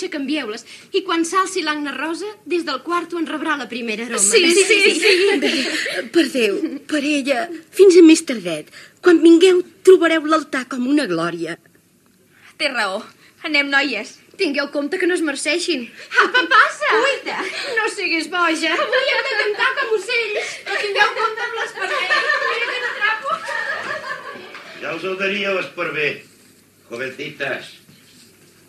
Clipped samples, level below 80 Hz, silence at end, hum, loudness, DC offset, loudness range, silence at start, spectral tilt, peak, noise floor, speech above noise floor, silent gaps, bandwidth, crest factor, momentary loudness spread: under 0.1%; -78 dBFS; 0.95 s; none; -17 LUFS; under 0.1%; 9 LU; 0 s; -2 dB/octave; 0 dBFS; -55 dBFS; 38 dB; none; 13.5 kHz; 18 dB; 14 LU